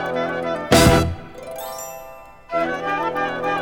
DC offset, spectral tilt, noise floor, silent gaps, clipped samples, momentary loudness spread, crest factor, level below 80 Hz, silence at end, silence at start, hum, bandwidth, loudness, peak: under 0.1%; -4.5 dB/octave; -40 dBFS; none; under 0.1%; 20 LU; 20 dB; -36 dBFS; 0 s; 0 s; none; 19 kHz; -20 LUFS; 0 dBFS